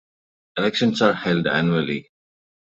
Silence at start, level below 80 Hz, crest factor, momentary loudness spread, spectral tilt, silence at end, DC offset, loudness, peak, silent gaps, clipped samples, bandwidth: 0.55 s; -60 dBFS; 20 dB; 10 LU; -6 dB/octave; 0.8 s; under 0.1%; -21 LUFS; -4 dBFS; none; under 0.1%; 8 kHz